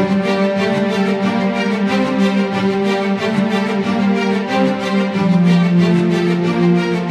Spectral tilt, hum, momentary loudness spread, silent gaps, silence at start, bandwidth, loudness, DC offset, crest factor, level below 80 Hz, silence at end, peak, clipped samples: -7 dB/octave; none; 4 LU; none; 0 s; 10 kHz; -15 LUFS; under 0.1%; 12 dB; -56 dBFS; 0 s; -4 dBFS; under 0.1%